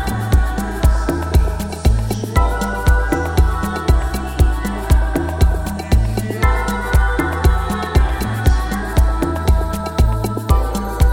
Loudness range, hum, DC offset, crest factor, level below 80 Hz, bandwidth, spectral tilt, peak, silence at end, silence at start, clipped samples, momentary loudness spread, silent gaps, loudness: 0 LU; none; under 0.1%; 14 dB; -18 dBFS; 16.5 kHz; -6 dB/octave; -2 dBFS; 0 s; 0 s; under 0.1%; 3 LU; none; -18 LUFS